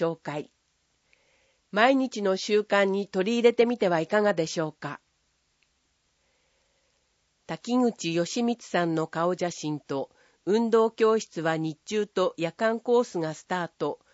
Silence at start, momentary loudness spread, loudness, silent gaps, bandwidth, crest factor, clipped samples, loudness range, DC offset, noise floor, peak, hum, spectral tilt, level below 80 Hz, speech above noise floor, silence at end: 0 s; 12 LU; -26 LUFS; none; 8 kHz; 22 dB; under 0.1%; 8 LU; under 0.1%; -72 dBFS; -6 dBFS; none; -5 dB/octave; -76 dBFS; 46 dB; 0.2 s